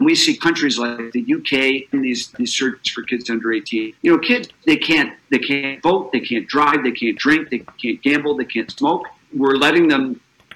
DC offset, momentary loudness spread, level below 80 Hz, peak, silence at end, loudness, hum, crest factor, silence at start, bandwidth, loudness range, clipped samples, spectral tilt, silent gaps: under 0.1%; 9 LU; -58 dBFS; -4 dBFS; 0.35 s; -18 LUFS; none; 16 dB; 0 s; 13 kHz; 2 LU; under 0.1%; -3.5 dB/octave; none